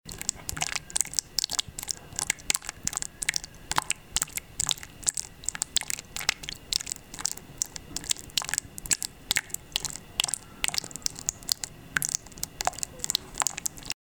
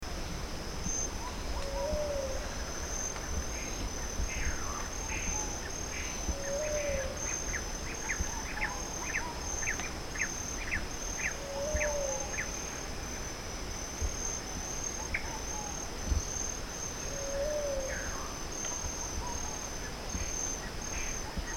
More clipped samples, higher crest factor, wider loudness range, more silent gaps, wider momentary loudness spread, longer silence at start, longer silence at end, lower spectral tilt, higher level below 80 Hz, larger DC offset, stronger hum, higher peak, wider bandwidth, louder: neither; first, 28 dB vs 18 dB; about the same, 1 LU vs 2 LU; neither; about the same, 5 LU vs 5 LU; about the same, 0.05 s vs 0 s; about the same, 0.1 s vs 0 s; second, 0.5 dB/octave vs -2.5 dB/octave; second, -52 dBFS vs -42 dBFS; first, 0.1% vs under 0.1%; neither; first, -4 dBFS vs -18 dBFS; about the same, over 20 kHz vs 19 kHz; first, -29 LUFS vs -35 LUFS